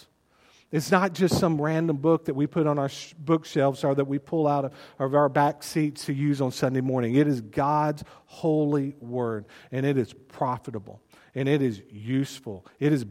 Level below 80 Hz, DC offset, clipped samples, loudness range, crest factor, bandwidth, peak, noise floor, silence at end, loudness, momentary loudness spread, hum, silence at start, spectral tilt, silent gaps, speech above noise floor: -60 dBFS; under 0.1%; under 0.1%; 4 LU; 22 dB; 16 kHz; -4 dBFS; -61 dBFS; 0 s; -26 LUFS; 12 LU; none; 0.7 s; -7 dB/octave; none; 36 dB